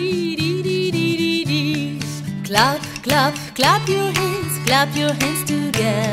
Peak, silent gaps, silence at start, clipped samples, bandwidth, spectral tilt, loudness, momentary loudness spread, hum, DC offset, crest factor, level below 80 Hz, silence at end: 0 dBFS; none; 0 s; under 0.1%; 16 kHz; -4.5 dB/octave; -19 LUFS; 6 LU; none; under 0.1%; 18 dB; -50 dBFS; 0 s